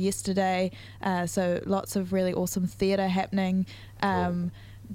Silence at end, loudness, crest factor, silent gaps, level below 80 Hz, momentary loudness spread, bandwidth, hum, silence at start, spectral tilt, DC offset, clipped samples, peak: 0 s; -28 LUFS; 20 dB; none; -54 dBFS; 6 LU; 16.5 kHz; none; 0 s; -5.5 dB/octave; under 0.1%; under 0.1%; -8 dBFS